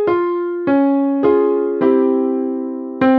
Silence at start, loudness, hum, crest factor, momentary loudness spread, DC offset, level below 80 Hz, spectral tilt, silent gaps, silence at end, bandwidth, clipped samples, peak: 0 s; -16 LUFS; none; 12 dB; 7 LU; under 0.1%; -58 dBFS; -9.5 dB/octave; none; 0 s; 4.7 kHz; under 0.1%; -2 dBFS